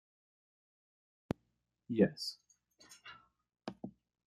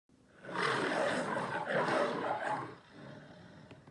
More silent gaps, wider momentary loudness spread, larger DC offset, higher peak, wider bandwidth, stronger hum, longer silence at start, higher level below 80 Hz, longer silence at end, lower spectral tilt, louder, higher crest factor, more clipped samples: neither; about the same, 24 LU vs 22 LU; neither; first, -14 dBFS vs -20 dBFS; first, 13 kHz vs 11 kHz; first, 60 Hz at -70 dBFS vs none; first, 1.9 s vs 0.4 s; first, -72 dBFS vs -78 dBFS; first, 0.35 s vs 0 s; first, -6 dB/octave vs -4.5 dB/octave; second, -37 LUFS vs -34 LUFS; first, 28 dB vs 16 dB; neither